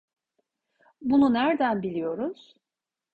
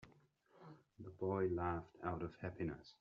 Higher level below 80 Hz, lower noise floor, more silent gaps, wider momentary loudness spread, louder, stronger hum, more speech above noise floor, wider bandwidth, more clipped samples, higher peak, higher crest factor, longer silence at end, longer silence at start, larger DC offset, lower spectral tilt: about the same, -64 dBFS vs -68 dBFS; first, -89 dBFS vs -71 dBFS; neither; second, 12 LU vs 22 LU; first, -25 LUFS vs -43 LUFS; neither; first, 65 dB vs 29 dB; second, 4.8 kHz vs 6.8 kHz; neither; first, -12 dBFS vs -28 dBFS; about the same, 16 dB vs 18 dB; first, 0.8 s vs 0.1 s; first, 1 s vs 0 s; neither; about the same, -8 dB/octave vs -7.5 dB/octave